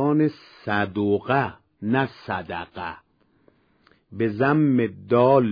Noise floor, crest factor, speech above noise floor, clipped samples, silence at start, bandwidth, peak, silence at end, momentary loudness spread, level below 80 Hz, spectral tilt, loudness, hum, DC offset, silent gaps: -61 dBFS; 18 dB; 39 dB; under 0.1%; 0 s; 5.2 kHz; -6 dBFS; 0 s; 15 LU; -62 dBFS; -10 dB/octave; -23 LUFS; none; under 0.1%; none